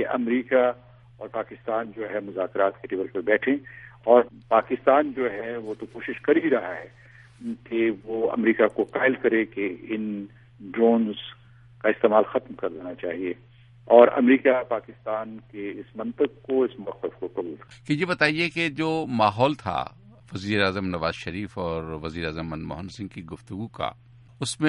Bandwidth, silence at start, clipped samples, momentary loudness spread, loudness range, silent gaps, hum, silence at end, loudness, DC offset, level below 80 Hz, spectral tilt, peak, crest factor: 11.5 kHz; 0 s; under 0.1%; 16 LU; 7 LU; none; none; 0 s; -24 LUFS; under 0.1%; -56 dBFS; -6 dB/octave; -2 dBFS; 24 dB